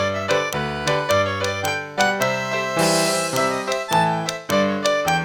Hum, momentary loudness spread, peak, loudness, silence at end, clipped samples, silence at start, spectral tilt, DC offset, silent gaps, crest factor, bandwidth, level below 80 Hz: none; 5 LU; -2 dBFS; -20 LUFS; 0 s; under 0.1%; 0 s; -3.5 dB/octave; under 0.1%; none; 18 dB; 19 kHz; -52 dBFS